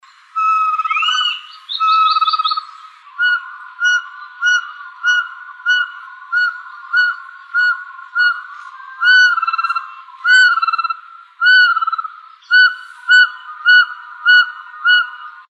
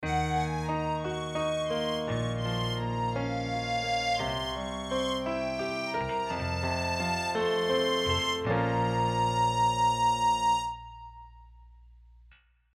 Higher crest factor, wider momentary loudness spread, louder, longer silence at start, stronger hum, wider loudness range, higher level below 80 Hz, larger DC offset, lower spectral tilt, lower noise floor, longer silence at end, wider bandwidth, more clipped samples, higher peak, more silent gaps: about the same, 16 dB vs 14 dB; first, 16 LU vs 6 LU; first, -14 LUFS vs -29 LUFS; first, 0.35 s vs 0 s; neither; about the same, 5 LU vs 4 LU; second, under -90 dBFS vs -50 dBFS; neither; second, 13 dB/octave vs -4.5 dB/octave; second, -38 dBFS vs -60 dBFS; second, 0.2 s vs 0.85 s; second, 9.2 kHz vs 15 kHz; neither; first, 0 dBFS vs -16 dBFS; neither